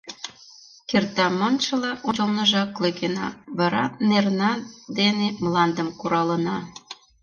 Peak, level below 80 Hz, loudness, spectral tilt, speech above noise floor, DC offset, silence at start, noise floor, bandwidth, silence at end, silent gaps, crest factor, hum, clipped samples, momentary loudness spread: -6 dBFS; -62 dBFS; -23 LUFS; -5 dB/octave; 26 dB; under 0.1%; 0.05 s; -49 dBFS; 7.2 kHz; 0.3 s; none; 18 dB; none; under 0.1%; 13 LU